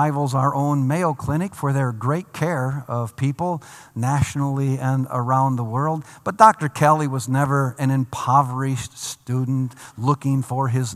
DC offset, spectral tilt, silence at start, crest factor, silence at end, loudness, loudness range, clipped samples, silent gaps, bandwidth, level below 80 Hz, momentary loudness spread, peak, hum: under 0.1%; -6.5 dB/octave; 0 s; 20 dB; 0 s; -21 LUFS; 5 LU; under 0.1%; none; 14.5 kHz; -54 dBFS; 9 LU; 0 dBFS; none